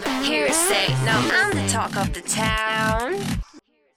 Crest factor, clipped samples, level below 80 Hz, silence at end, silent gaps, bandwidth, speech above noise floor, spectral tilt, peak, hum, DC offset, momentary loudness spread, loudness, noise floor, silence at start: 16 dB; under 0.1%; -38 dBFS; 0.4 s; none; 17.5 kHz; 30 dB; -3 dB/octave; -6 dBFS; none; under 0.1%; 8 LU; -21 LUFS; -51 dBFS; 0 s